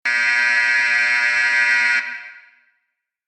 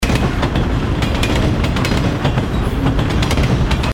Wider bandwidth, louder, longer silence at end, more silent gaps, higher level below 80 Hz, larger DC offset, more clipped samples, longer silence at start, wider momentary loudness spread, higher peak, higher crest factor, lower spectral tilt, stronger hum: second, 12 kHz vs 17 kHz; about the same, -15 LUFS vs -17 LUFS; first, 0.9 s vs 0 s; neither; second, -68 dBFS vs -20 dBFS; neither; neither; about the same, 0.05 s vs 0 s; first, 6 LU vs 2 LU; second, -6 dBFS vs -2 dBFS; about the same, 14 dB vs 14 dB; second, 1 dB/octave vs -6 dB/octave; neither